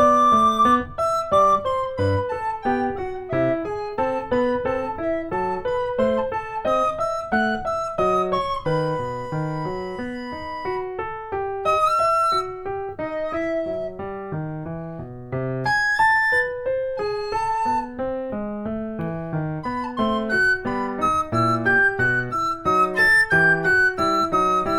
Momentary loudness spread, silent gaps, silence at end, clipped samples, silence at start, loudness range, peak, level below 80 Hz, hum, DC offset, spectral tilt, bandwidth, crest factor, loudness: 13 LU; none; 0 s; under 0.1%; 0 s; 7 LU; -6 dBFS; -46 dBFS; none; under 0.1%; -5.5 dB/octave; over 20 kHz; 16 dB; -22 LUFS